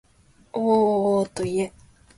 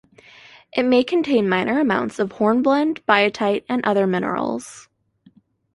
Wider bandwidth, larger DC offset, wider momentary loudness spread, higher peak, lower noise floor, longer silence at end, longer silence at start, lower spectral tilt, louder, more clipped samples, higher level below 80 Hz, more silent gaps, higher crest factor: about the same, 11.5 kHz vs 11.5 kHz; neither; first, 11 LU vs 8 LU; second, -8 dBFS vs -2 dBFS; about the same, -57 dBFS vs -55 dBFS; second, 0.5 s vs 0.95 s; second, 0.55 s vs 0.75 s; about the same, -6.5 dB/octave vs -5.5 dB/octave; second, -23 LUFS vs -19 LUFS; neither; first, -56 dBFS vs -62 dBFS; neither; about the same, 16 dB vs 18 dB